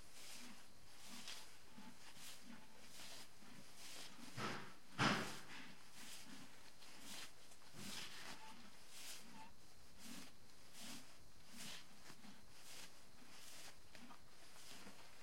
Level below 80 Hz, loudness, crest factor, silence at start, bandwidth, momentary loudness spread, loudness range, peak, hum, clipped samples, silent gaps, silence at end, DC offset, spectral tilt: -78 dBFS; -53 LUFS; 30 dB; 0 s; 16.5 kHz; 13 LU; 11 LU; -24 dBFS; none; under 0.1%; none; 0 s; 0.3%; -3 dB/octave